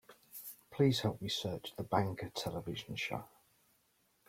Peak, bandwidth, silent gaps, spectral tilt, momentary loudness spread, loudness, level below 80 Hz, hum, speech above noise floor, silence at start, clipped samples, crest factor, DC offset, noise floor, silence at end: -16 dBFS; 16.5 kHz; none; -5.5 dB/octave; 17 LU; -37 LUFS; -68 dBFS; none; 39 dB; 0.1 s; under 0.1%; 22 dB; under 0.1%; -75 dBFS; 1 s